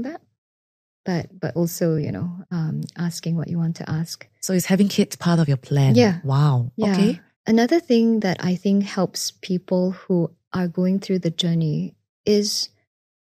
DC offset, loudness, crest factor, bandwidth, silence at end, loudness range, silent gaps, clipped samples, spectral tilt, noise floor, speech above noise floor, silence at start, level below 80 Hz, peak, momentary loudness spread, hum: under 0.1%; -22 LUFS; 18 dB; 15.5 kHz; 0.7 s; 6 LU; 0.38-1.04 s, 7.36-7.44 s, 10.47-10.51 s, 12.09-12.24 s; under 0.1%; -6 dB/octave; under -90 dBFS; over 69 dB; 0 s; -60 dBFS; -2 dBFS; 10 LU; none